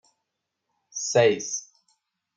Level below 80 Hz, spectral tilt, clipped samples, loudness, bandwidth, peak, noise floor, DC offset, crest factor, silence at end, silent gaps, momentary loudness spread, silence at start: -76 dBFS; -3 dB/octave; under 0.1%; -24 LUFS; 9.4 kHz; -8 dBFS; -82 dBFS; under 0.1%; 20 dB; 0.75 s; none; 13 LU; 0.95 s